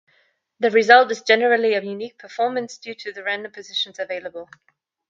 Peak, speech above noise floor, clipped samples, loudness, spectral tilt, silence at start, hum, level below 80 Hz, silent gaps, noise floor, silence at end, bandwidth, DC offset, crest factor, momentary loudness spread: 0 dBFS; 43 dB; under 0.1%; -19 LUFS; -3 dB/octave; 0.6 s; none; -76 dBFS; none; -64 dBFS; 0.65 s; 7.6 kHz; under 0.1%; 22 dB; 19 LU